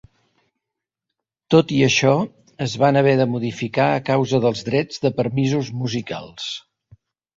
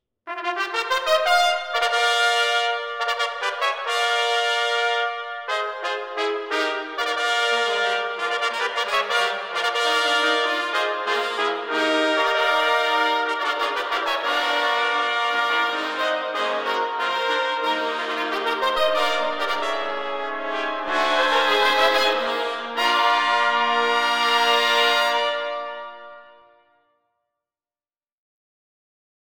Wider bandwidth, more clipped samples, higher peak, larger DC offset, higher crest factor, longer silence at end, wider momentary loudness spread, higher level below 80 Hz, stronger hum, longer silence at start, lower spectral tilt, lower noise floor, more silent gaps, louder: second, 7.8 kHz vs 17 kHz; neither; about the same, -2 dBFS vs -4 dBFS; neither; about the same, 18 dB vs 18 dB; second, 0.75 s vs 2.95 s; first, 13 LU vs 8 LU; first, -58 dBFS vs -68 dBFS; neither; first, 1.5 s vs 0.25 s; first, -5.5 dB/octave vs 0 dB/octave; second, -84 dBFS vs under -90 dBFS; neither; about the same, -20 LUFS vs -21 LUFS